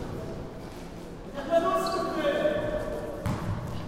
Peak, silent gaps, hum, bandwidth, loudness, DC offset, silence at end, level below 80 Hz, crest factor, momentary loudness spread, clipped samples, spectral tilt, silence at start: -14 dBFS; none; none; 16 kHz; -30 LUFS; under 0.1%; 0 s; -44 dBFS; 16 dB; 15 LU; under 0.1%; -6 dB/octave; 0 s